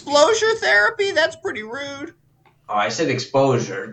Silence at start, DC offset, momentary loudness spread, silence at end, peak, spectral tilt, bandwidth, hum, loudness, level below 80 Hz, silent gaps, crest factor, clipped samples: 0 s; under 0.1%; 14 LU; 0 s; -2 dBFS; -3.5 dB/octave; 9.2 kHz; none; -19 LUFS; -62 dBFS; none; 18 dB; under 0.1%